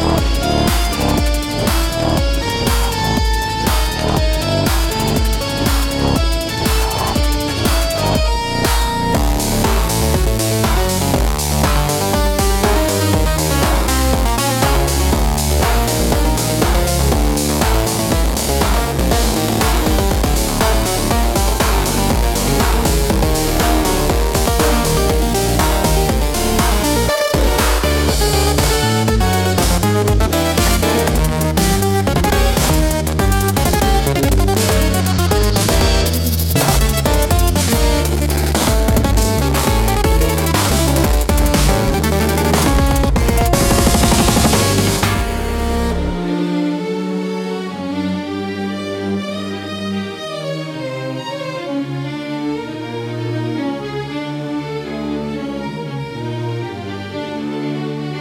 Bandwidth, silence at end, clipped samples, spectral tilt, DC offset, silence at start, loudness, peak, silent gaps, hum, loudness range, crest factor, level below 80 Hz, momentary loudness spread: 17.5 kHz; 0 s; under 0.1%; -4.5 dB/octave; under 0.1%; 0 s; -16 LUFS; -2 dBFS; none; none; 8 LU; 14 dB; -20 dBFS; 9 LU